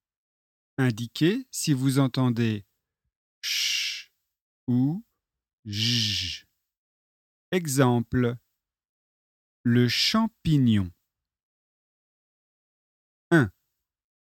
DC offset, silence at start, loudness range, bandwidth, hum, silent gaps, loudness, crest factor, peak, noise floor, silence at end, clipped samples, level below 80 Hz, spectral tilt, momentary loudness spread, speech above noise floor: under 0.1%; 0.8 s; 4 LU; 17 kHz; none; 3.16-3.42 s, 4.41-4.67 s, 5.53-5.63 s, 6.77-7.52 s, 8.89-9.64 s, 11.43-13.31 s; -25 LUFS; 22 dB; -6 dBFS; -81 dBFS; 0.75 s; under 0.1%; -58 dBFS; -5 dB/octave; 13 LU; 57 dB